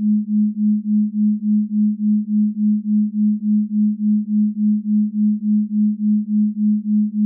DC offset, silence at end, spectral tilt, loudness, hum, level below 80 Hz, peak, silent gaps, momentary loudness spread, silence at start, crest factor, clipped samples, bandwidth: under 0.1%; 0 s; -26 dB/octave; -18 LUFS; none; -88 dBFS; -12 dBFS; none; 2 LU; 0 s; 6 dB; under 0.1%; 0.4 kHz